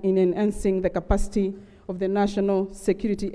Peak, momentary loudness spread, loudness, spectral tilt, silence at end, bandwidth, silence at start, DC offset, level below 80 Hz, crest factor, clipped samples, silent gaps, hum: -8 dBFS; 7 LU; -25 LUFS; -7 dB/octave; 0 s; 11 kHz; 0 s; under 0.1%; -34 dBFS; 16 dB; under 0.1%; none; none